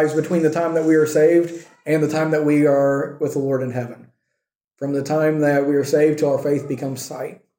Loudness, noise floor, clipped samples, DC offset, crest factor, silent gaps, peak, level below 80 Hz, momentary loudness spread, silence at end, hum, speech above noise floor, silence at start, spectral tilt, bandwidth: -19 LUFS; -79 dBFS; under 0.1%; under 0.1%; 14 dB; 4.55-4.59 s; -6 dBFS; -68 dBFS; 12 LU; 0.25 s; none; 61 dB; 0 s; -6.5 dB/octave; 17 kHz